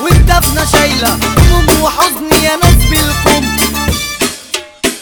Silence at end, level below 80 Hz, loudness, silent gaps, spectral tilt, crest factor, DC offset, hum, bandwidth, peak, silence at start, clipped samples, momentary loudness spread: 0 s; -16 dBFS; -10 LUFS; none; -4 dB/octave; 10 dB; under 0.1%; none; over 20 kHz; 0 dBFS; 0 s; 1%; 7 LU